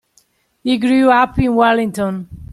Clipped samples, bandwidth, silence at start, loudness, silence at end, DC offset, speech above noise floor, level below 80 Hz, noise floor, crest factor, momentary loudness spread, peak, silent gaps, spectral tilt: under 0.1%; 13 kHz; 0.65 s; -15 LUFS; 0.05 s; under 0.1%; 44 dB; -38 dBFS; -58 dBFS; 14 dB; 11 LU; -2 dBFS; none; -6.5 dB/octave